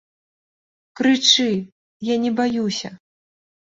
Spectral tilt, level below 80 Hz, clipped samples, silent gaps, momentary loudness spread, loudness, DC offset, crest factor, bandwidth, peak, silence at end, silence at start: -3 dB/octave; -64 dBFS; under 0.1%; 1.72-2.00 s; 14 LU; -19 LUFS; under 0.1%; 22 dB; 8 kHz; -2 dBFS; 0.8 s; 1 s